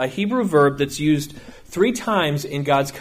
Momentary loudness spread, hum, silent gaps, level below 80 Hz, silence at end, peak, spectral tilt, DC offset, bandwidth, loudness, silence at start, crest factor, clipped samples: 7 LU; none; none; -50 dBFS; 0 s; -4 dBFS; -5.5 dB/octave; under 0.1%; 15.5 kHz; -20 LUFS; 0 s; 16 dB; under 0.1%